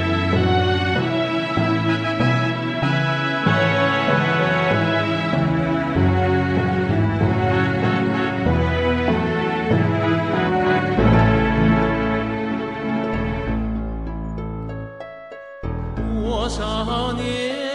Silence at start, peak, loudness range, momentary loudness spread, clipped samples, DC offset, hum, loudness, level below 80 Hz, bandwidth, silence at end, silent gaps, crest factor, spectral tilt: 0 s; -4 dBFS; 8 LU; 11 LU; under 0.1%; under 0.1%; none; -20 LUFS; -34 dBFS; 10.5 kHz; 0 s; none; 16 dB; -7 dB/octave